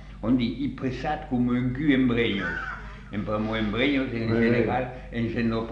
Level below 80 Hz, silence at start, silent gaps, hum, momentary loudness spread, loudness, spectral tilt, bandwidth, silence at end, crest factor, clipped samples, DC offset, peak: -42 dBFS; 0 s; none; none; 10 LU; -26 LUFS; -8 dB/octave; 7 kHz; 0 s; 16 dB; under 0.1%; under 0.1%; -8 dBFS